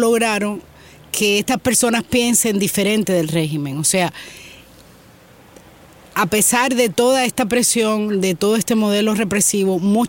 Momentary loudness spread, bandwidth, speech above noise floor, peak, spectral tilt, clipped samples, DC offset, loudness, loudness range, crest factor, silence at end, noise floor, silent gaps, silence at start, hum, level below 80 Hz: 7 LU; 17 kHz; 29 dB; -2 dBFS; -3.5 dB/octave; under 0.1%; under 0.1%; -17 LUFS; 5 LU; 16 dB; 0 s; -46 dBFS; none; 0 s; none; -52 dBFS